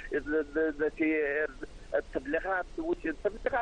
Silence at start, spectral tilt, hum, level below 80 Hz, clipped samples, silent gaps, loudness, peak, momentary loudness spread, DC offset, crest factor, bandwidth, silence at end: 0 s; -6.5 dB/octave; none; -50 dBFS; under 0.1%; none; -32 LUFS; -16 dBFS; 6 LU; under 0.1%; 14 dB; 9.4 kHz; 0 s